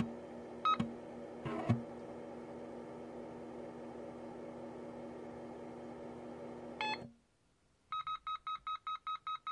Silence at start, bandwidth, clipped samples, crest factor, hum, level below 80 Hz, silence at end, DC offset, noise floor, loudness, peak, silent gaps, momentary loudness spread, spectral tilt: 0 s; 11 kHz; under 0.1%; 24 dB; none; -72 dBFS; 0 s; under 0.1%; -74 dBFS; -43 LUFS; -18 dBFS; none; 12 LU; -6.5 dB/octave